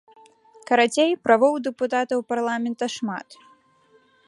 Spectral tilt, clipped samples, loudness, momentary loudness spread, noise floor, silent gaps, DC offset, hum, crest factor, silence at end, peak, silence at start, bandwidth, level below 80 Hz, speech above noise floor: -3.5 dB/octave; under 0.1%; -22 LUFS; 10 LU; -59 dBFS; none; under 0.1%; none; 22 dB; 0.95 s; -2 dBFS; 0.7 s; 11.5 kHz; -76 dBFS; 37 dB